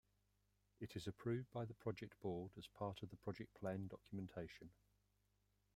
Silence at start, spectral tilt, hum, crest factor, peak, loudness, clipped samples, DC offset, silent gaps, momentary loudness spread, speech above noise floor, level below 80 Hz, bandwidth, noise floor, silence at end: 0.8 s; -7 dB/octave; 50 Hz at -70 dBFS; 20 dB; -30 dBFS; -50 LUFS; under 0.1%; under 0.1%; none; 9 LU; 33 dB; -76 dBFS; 16 kHz; -83 dBFS; 1.05 s